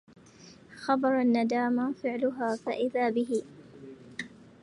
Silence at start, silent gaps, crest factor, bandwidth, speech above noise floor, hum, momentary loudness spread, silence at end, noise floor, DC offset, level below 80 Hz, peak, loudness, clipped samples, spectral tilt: 0.4 s; none; 18 dB; 11 kHz; 26 dB; none; 21 LU; 0.2 s; -53 dBFS; under 0.1%; -72 dBFS; -12 dBFS; -29 LUFS; under 0.1%; -5.5 dB/octave